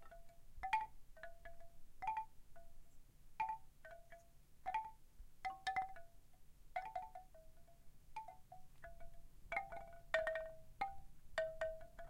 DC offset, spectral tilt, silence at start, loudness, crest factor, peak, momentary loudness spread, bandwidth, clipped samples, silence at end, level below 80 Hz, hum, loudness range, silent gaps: under 0.1%; -3.5 dB/octave; 0 s; -47 LUFS; 28 dB; -20 dBFS; 23 LU; 16 kHz; under 0.1%; 0 s; -62 dBFS; none; 7 LU; none